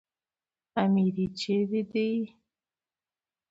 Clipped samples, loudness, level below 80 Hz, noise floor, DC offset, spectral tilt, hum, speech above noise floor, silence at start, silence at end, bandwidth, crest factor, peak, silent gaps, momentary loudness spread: under 0.1%; -28 LUFS; -68 dBFS; under -90 dBFS; under 0.1%; -7.5 dB/octave; none; over 63 dB; 0.75 s; 1.25 s; 8 kHz; 18 dB; -12 dBFS; none; 9 LU